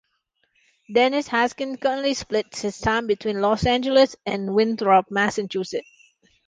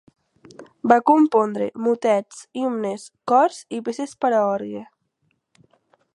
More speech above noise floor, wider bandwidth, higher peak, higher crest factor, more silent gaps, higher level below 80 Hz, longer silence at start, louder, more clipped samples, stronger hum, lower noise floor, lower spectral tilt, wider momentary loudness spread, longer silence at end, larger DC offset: about the same, 50 dB vs 50 dB; second, 9.8 kHz vs 11.5 kHz; second, -6 dBFS vs 0 dBFS; about the same, 18 dB vs 22 dB; neither; first, -48 dBFS vs -74 dBFS; first, 0.9 s vs 0.6 s; about the same, -22 LUFS vs -21 LUFS; neither; neither; about the same, -71 dBFS vs -71 dBFS; about the same, -4.5 dB/octave vs -5.5 dB/octave; second, 9 LU vs 14 LU; second, 0.65 s vs 1.3 s; neither